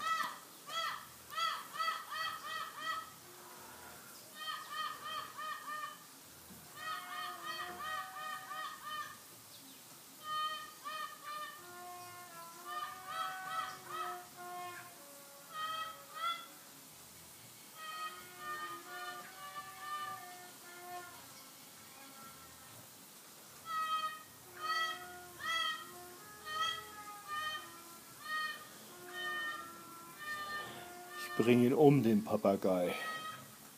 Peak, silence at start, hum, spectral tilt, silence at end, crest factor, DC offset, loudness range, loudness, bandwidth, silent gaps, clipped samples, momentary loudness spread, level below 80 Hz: -14 dBFS; 0 s; none; -4.5 dB/octave; 0 s; 28 dB; under 0.1%; 12 LU; -39 LUFS; 15.5 kHz; none; under 0.1%; 17 LU; -82 dBFS